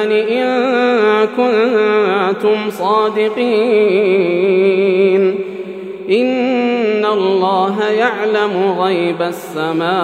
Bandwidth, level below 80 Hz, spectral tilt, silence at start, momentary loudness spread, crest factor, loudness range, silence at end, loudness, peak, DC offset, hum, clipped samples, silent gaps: 14 kHz; -74 dBFS; -6 dB/octave; 0 s; 5 LU; 12 dB; 2 LU; 0 s; -14 LUFS; 0 dBFS; under 0.1%; none; under 0.1%; none